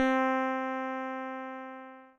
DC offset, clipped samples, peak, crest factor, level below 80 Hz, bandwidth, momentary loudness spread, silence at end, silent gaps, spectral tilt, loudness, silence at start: under 0.1%; under 0.1%; -14 dBFS; 18 dB; -74 dBFS; 7.2 kHz; 16 LU; 0.1 s; none; -4 dB/octave; -32 LUFS; 0 s